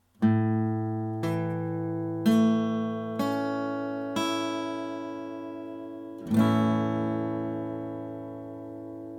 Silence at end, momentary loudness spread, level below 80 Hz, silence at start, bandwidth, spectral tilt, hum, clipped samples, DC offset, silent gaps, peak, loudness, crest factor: 0 s; 15 LU; -66 dBFS; 0.2 s; 15 kHz; -7 dB/octave; none; under 0.1%; under 0.1%; none; -10 dBFS; -29 LUFS; 18 dB